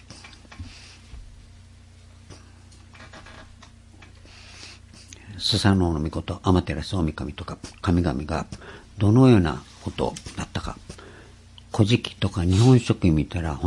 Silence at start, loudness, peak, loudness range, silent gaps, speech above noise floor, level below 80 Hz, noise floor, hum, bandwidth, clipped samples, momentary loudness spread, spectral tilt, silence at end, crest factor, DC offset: 0.1 s; -23 LUFS; -2 dBFS; 22 LU; none; 27 dB; -44 dBFS; -48 dBFS; none; 11.5 kHz; under 0.1%; 26 LU; -6.5 dB/octave; 0 s; 22 dB; under 0.1%